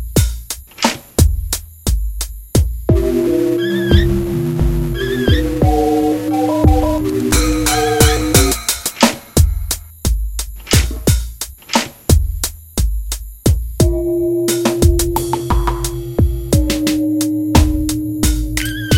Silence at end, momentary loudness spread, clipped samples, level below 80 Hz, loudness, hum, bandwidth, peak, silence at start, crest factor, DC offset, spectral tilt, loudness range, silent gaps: 0 s; 8 LU; under 0.1%; -20 dBFS; -16 LUFS; none; 17 kHz; 0 dBFS; 0 s; 14 dB; under 0.1%; -5 dB/octave; 4 LU; none